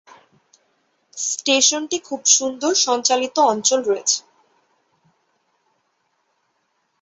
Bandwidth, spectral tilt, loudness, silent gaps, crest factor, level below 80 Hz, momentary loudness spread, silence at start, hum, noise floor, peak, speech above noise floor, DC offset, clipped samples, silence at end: 8.2 kHz; 0 dB/octave; -17 LUFS; none; 20 dB; -72 dBFS; 9 LU; 1.15 s; none; -69 dBFS; -2 dBFS; 50 dB; under 0.1%; under 0.1%; 2.8 s